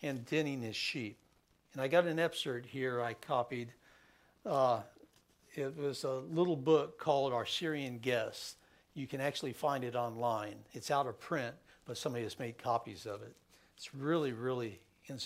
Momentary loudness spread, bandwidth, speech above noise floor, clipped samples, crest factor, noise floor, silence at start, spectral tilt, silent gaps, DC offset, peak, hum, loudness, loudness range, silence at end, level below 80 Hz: 15 LU; 16 kHz; 31 dB; under 0.1%; 22 dB; -67 dBFS; 0 s; -5 dB/octave; none; under 0.1%; -14 dBFS; none; -36 LUFS; 5 LU; 0 s; -78 dBFS